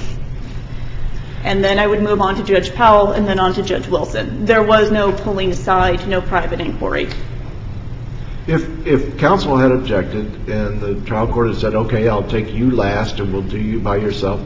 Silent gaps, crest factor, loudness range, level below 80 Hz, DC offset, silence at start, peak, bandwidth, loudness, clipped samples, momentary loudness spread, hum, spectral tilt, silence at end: none; 16 dB; 5 LU; -28 dBFS; under 0.1%; 0 s; 0 dBFS; 7.6 kHz; -16 LUFS; under 0.1%; 17 LU; none; -7 dB/octave; 0 s